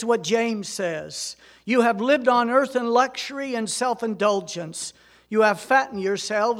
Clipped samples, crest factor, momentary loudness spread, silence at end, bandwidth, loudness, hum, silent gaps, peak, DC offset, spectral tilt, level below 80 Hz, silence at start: under 0.1%; 18 dB; 13 LU; 0 s; 16 kHz; -23 LUFS; none; none; -4 dBFS; under 0.1%; -3.5 dB/octave; -68 dBFS; 0 s